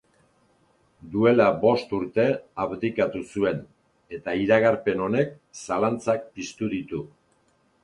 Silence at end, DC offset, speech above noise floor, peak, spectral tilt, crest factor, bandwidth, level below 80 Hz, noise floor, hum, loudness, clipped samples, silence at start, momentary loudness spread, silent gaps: 0.8 s; under 0.1%; 41 dB; -4 dBFS; -6.5 dB/octave; 20 dB; 11 kHz; -58 dBFS; -65 dBFS; none; -24 LUFS; under 0.1%; 1.05 s; 15 LU; none